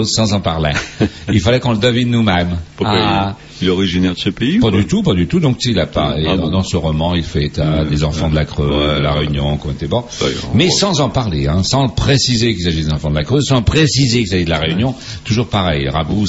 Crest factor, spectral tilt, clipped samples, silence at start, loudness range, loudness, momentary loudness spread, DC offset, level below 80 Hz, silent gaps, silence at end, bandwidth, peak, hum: 14 dB; -5.5 dB/octave; under 0.1%; 0 s; 2 LU; -15 LUFS; 6 LU; under 0.1%; -28 dBFS; none; 0 s; 8 kHz; 0 dBFS; none